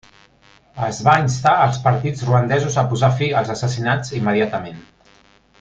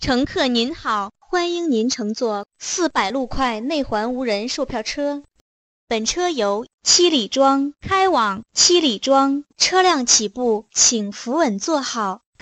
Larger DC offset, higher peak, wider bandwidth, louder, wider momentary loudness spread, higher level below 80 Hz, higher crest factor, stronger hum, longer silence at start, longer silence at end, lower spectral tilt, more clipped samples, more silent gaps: neither; about the same, -2 dBFS vs -2 dBFS; second, 7.8 kHz vs 9 kHz; about the same, -18 LUFS vs -19 LUFS; about the same, 8 LU vs 10 LU; about the same, -50 dBFS vs -46 dBFS; about the same, 16 dB vs 18 dB; neither; first, 0.75 s vs 0 s; first, 0.8 s vs 0.25 s; first, -6 dB/octave vs -2 dB/octave; neither; second, none vs 5.41-5.88 s, 6.74-6.78 s